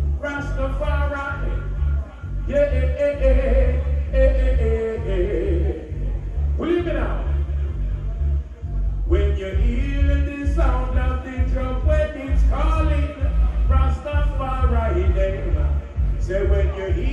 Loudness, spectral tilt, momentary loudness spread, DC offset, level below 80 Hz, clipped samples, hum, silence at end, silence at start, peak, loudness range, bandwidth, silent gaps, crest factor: -22 LUFS; -8.5 dB/octave; 7 LU; under 0.1%; -20 dBFS; under 0.1%; none; 0 s; 0 s; -6 dBFS; 3 LU; 7 kHz; none; 14 dB